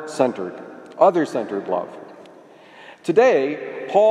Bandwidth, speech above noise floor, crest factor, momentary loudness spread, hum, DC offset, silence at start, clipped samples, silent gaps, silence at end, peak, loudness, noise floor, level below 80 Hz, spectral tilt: 11.5 kHz; 26 dB; 18 dB; 19 LU; none; under 0.1%; 0 s; under 0.1%; none; 0 s; -2 dBFS; -20 LUFS; -46 dBFS; -76 dBFS; -5.5 dB/octave